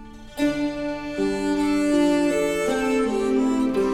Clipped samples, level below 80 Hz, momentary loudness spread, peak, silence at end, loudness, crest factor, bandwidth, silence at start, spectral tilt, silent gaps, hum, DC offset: under 0.1%; -44 dBFS; 7 LU; -10 dBFS; 0 s; -22 LUFS; 12 dB; 15.5 kHz; 0 s; -5 dB/octave; none; none; under 0.1%